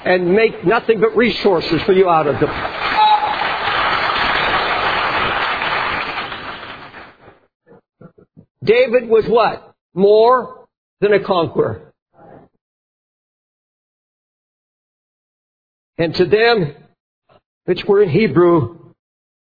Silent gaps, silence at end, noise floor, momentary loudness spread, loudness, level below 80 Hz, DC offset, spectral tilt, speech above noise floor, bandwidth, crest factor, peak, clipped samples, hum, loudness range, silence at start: 7.55-7.60 s, 8.50-8.55 s, 9.81-9.90 s, 10.77-10.97 s, 12.02-12.06 s, 12.61-15.93 s, 17.00-17.22 s, 17.46-17.61 s; 0.8 s; -45 dBFS; 13 LU; -15 LUFS; -46 dBFS; under 0.1%; -7.5 dB/octave; 31 dB; 5 kHz; 16 dB; 0 dBFS; under 0.1%; none; 8 LU; 0 s